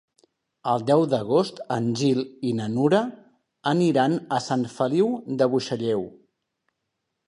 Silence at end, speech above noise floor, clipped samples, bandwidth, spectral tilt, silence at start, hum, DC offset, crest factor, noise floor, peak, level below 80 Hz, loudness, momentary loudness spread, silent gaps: 1.2 s; 57 dB; under 0.1%; 11 kHz; -6.5 dB/octave; 0.65 s; none; under 0.1%; 18 dB; -80 dBFS; -6 dBFS; -68 dBFS; -24 LUFS; 7 LU; none